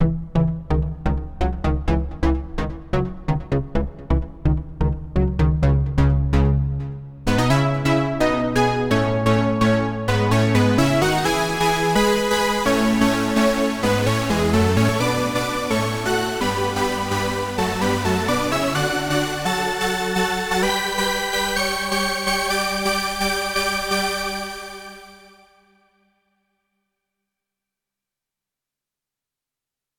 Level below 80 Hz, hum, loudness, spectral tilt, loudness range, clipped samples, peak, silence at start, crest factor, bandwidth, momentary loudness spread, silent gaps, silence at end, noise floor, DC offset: -30 dBFS; none; -20 LUFS; -5 dB/octave; 6 LU; under 0.1%; -4 dBFS; 0 s; 16 dB; 20 kHz; 7 LU; none; 4.85 s; -87 dBFS; under 0.1%